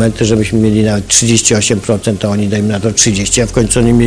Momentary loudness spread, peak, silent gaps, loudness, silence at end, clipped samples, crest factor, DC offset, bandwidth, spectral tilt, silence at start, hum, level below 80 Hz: 5 LU; 0 dBFS; none; -11 LUFS; 0 s; 0.3%; 10 dB; under 0.1%; 11 kHz; -4 dB/octave; 0 s; none; -30 dBFS